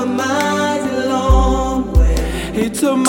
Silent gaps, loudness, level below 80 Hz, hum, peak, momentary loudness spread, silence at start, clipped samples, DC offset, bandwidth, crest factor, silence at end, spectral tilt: none; -16 LUFS; -18 dBFS; none; 0 dBFS; 6 LU; 0 s; under 0.1%; under 0.1%; 17 kHz; 14 dB; 0 s; -5.5 dB/octave